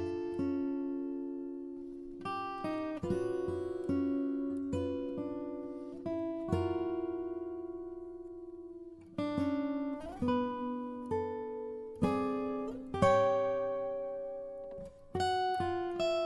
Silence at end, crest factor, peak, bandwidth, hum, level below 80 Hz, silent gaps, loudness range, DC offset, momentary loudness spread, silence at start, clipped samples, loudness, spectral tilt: 0 s; 22 dB; -14 dBFS; 11.5 kHz; none; -60 dBFS; none; 5 LU; under 0.1%; 12 LU; 0 s; under 0.1%; -36 LUFS; -7 dB/octave